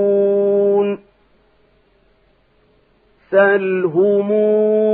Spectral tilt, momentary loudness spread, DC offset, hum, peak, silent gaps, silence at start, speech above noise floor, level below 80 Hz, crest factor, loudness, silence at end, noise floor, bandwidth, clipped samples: -11 dB/octave; 4 LU; under 0.1%; none; -2 dBFS; none; 0 s; 43 dB; -64 dBFS; 16 dB; -15 LUFS; 0 s; -57 dBFS; 4 kHz; under 0.1%